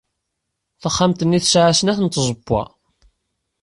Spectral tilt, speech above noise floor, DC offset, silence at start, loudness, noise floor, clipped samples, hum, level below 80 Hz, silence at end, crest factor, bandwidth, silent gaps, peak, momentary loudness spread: -4.5 dB/octave; 60 dB; under 0.1%; 0.85 s; -17 LUFS; -77 dBFS; under 0.1%; none; -46 dBFS; 1 s; 16 dB; 11.5 kHz; none; -4 dBFS; 9 LU